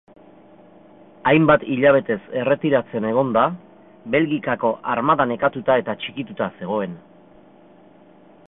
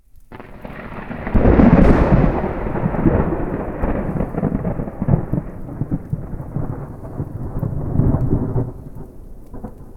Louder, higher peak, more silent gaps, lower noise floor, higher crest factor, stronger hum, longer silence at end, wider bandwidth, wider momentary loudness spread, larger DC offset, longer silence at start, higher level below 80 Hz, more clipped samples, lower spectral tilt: about the same, -20 LUFS vs -19 LUFS; about the same, -2 dBFS vs 0 dBFS; neither; first, -49 dBFS vs -39 dBFS; about the same, 20 dB vs 18 dB; neither; first, 1.5 s vs 0 s; second, 4 kHz vs 5.8 kHz; second, 11 LU vs 23 LU; neither; first, 1.25 s vs 0.15 s; second, -58 dBFS vs -24 dBFS; neither; about the same, -11 dB/octave vs -10.5 dB/octave